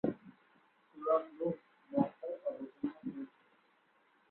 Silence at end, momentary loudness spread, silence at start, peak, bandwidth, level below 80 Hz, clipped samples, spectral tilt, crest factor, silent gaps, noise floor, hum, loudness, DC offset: 1.05 s; 13 LU; 0.05 s; -16 dBFS; 4.2 kHz; -78 dBFS; under 0.1%; -8.5 dB/octave; 22 dB; none; -72 dBFS; none; -39 LUFS; under 0.1%